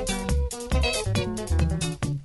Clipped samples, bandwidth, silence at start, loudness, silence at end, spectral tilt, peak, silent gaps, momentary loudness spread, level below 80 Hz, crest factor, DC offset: under 0.1%; 12 kHz; 0 s; -26 LUFS; 0 s; -5 dB/octave; -10 dBFS; none; 4 LU; -30 dBFS; 16 dB; under 0.1%